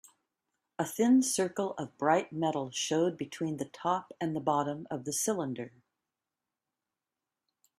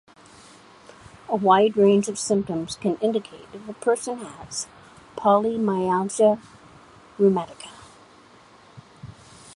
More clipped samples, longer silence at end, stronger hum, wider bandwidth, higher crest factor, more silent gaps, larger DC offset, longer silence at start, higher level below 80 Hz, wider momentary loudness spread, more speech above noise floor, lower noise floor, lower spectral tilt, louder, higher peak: neither; first, 2.1 s vs 0.05 s; neither; first, 15 kHz vs 11.5 kHz; about the same, 20 dB vs 20 dB; neither; neither; second, 0.8 s vs 1.3 s; second, -76 dBFS vs -60 dBFS; second, 12 LU vs 23 LU; first, 59 dB vs 29 dB; first, -90 dBFS vs -51 dBFS; about the same, -4.5 dB/octave vs -5.5 dB/octave; second, -31 LUFS vs -22 LUFS; second, -12 dBFS vs -4 dBFS